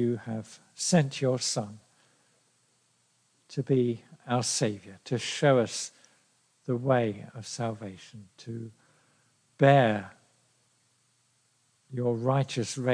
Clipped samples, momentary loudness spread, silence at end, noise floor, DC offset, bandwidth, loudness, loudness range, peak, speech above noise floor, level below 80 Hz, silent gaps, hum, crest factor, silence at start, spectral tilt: under 0.1%; 18 LU; 0 s; -70 dBFS; under 0.1%; 10.5 kHz; -28 LUFS; 4 LU; -8 dBFS; 42 dB; -78 dBFS; none; none; 22 dB; 0 s; -5 dB/octave